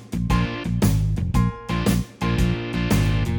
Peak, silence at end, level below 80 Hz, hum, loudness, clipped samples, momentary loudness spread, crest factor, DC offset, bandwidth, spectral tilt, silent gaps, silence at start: -6 dBFS; 0 s; -28 dBFS; none; -22 LUFS; under 0.1%; 4 LU; 14 dB; under 0.1%; over 20 kHz; -6.5 dB/octave; none; 0 s